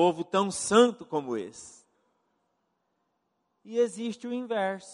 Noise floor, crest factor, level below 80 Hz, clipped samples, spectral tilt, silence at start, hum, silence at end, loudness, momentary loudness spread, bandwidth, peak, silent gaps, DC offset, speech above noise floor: -77 dBFS; 22 dB; -72 dBFS; under 0.1%; -4 dB/octave; 0 s; none; 0 s; -28 LUFS; 14 LU; 11.5 kHz; -6 dBFS; none; under 0.1%; 50 dB